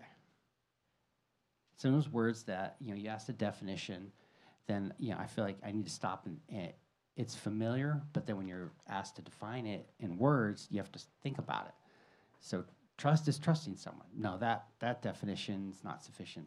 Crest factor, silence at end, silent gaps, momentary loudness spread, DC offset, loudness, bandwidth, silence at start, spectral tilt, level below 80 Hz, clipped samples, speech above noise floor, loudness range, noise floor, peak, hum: 22 dB; 0 s; none; 16 LU; under 0.1%; -39 LUFS; 11.5 kHz; 0 s; -6.5 dB/octave; -80 dBFS; under 0.1%; 44 dB; 4 LU; -82 dBFS; -18 dBFS; none